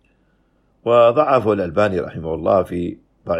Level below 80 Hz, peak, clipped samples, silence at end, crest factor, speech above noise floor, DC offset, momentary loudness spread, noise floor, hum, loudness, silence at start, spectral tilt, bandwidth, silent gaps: -48 dBFS; -2 dBFS; under 0.1%; 0 s; 16 dB; 44 dB; under 0.1%; 14 LU; -60 dBFS; none; -17 LUFS; 0.85 s; -8 dB/octave; 10.5 kHz; none